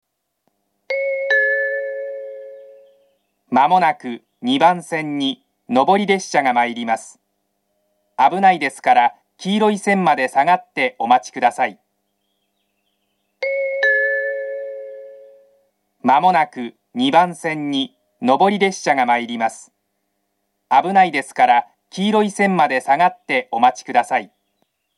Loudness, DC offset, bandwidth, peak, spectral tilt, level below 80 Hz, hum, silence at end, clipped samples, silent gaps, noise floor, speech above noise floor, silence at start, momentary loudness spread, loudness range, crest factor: -17 LUFS; under 0.1%; 12 kHz; 0 dBFS; -4.5 dB/octave; -78 dBFS; none; 0.7 s; under 0.1%; none; -72 dBFS; 55 dB; 0.9 s; 13 LU; 5 LU; 18 dB